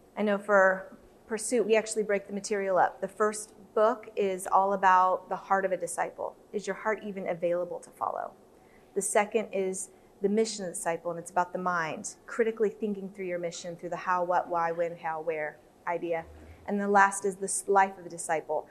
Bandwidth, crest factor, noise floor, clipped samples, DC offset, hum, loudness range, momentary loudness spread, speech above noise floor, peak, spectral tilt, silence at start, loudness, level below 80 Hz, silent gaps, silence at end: 13 kHz; 22 dB; -57 dBFS; under 0.1%; under 0.1%; none; 5 LU; 13 LU; 28 dB; -8 dBFS; -4 dB/octave; 0.15 s; -29 LUFS; -68 dBFS; none; 0.05 s